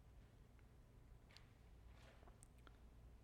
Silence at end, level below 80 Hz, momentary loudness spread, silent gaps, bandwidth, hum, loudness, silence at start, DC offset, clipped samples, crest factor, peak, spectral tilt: 0 s; -66 dBFS; 3 LU; none; 13 kHz; none; -67 LUFS; 0 s; under 0.1%; under 0.1%; 22 dB; -42 dBFS; -5 dB/octave